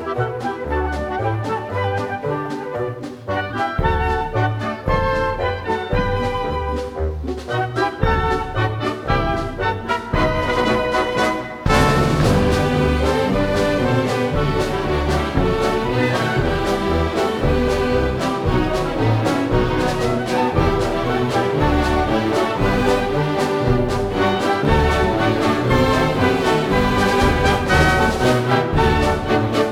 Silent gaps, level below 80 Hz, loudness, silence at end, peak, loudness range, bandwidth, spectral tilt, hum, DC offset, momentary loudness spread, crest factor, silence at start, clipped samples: none; -28 dBFS; -19 LUFS; 0 s; -2 dBFS; 5 LU; 16.5 kHz; -6 dB/octave; none; under 0.1%; 7 LU; 16 dB; 0 s; under 0.1%